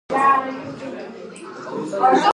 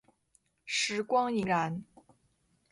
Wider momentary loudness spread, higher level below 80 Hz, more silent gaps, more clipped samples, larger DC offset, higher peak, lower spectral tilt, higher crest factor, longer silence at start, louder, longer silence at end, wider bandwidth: first, 19 LU vs 11 LU; about the same, -66 dBFS vs -70 dBFS; neither; neither; neither; first, -2 dBFS vs -16 dBFS; about the same, -4.5 dB/octave vs -3.5 dB/octave; about the same, 18 dB vs 18 dB; second, 0.1 s vs 0.65 s; first, -20 LUFS vs -31 LUFS; second, 0 s vs 0.9 s; about the same, 11 kHz vs 11.5 kHz